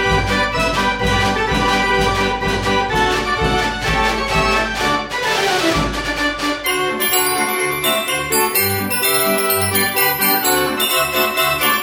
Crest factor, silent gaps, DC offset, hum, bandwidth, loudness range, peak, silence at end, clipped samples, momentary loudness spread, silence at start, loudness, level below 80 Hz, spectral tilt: 16 dB; none; under 0.1%; none; 19 kHz; 2 LU; -2 dBFS; 0 s; under 0.1%; 4 LU; 0 s; -16 LUFS; -32 dBFS; -3 dB/octave